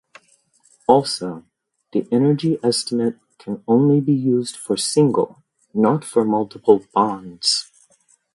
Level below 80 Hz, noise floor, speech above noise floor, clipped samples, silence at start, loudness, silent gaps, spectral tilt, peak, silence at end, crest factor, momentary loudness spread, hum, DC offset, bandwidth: -64 dBFS; -59 dBFS; 41 dB; under 0.1%; 0.9 s; -19 LUFS; none; -5.5 dB/octave; 0 dBFS; 0.7 s; 20 dB; 10 LU; none; under 0.1%; 11.5 kHz